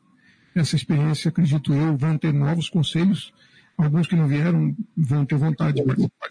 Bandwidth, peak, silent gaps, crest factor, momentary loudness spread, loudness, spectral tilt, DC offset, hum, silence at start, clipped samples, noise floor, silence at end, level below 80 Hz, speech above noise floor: 10.5 kHz; -12 dBFS; none; 10 dB; 5 LU; -22 LUFS; -7 dB/octave; under 0.1%; none; 0.55 s; under 0.1%; -57 dBFS; 0 s; -56 dBFS; 37 dB